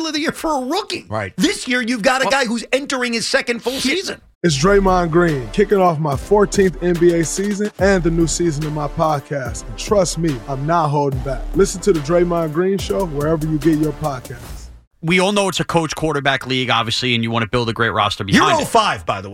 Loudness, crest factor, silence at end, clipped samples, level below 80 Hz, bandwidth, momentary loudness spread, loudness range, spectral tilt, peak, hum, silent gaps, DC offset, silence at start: -17 LUFS; 16 dB; 0 s; under 0.1%; -34 dBFS; 16.5 kHz; 8 LU; 3 LU; -4.5 dB/octave; -2 dBFS; none; 4.35-4.41 s, 14.87-14.91 s; under 0.1%; 0 s